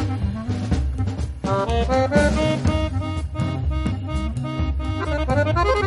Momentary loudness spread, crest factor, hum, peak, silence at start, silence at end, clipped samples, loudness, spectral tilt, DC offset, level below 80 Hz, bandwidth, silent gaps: 7 LU; 16 dB; none; -4 dBFS; 0 s; 0 s; under 0.1%; -23 LUFS; -7 dB/octave; under 0.1%; -28 dBFS; 11.5 kHz; none